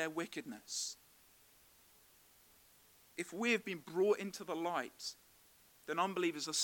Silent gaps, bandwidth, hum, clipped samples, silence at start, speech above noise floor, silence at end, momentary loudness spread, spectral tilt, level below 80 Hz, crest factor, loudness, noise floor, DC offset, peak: none; 18 kHz; none; under 0.1%; 0 s; 28 dB; 0 s; 12 LU; -2.5 dB/octave; -82 dBFS; 20 dB; -39 LUFS; -67 dBFS; under 0.1%; -22 dBFS